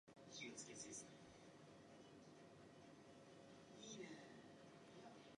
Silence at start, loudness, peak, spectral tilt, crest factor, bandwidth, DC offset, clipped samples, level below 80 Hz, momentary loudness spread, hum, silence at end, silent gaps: 0.05 s; -60 LUFS; -42 dBFS; -3 dB/octave; 18 dB; 10.5 kHz; under 0.1%; under 0.1%; -88 dBFS; 10 LU; none; 0.05 s; none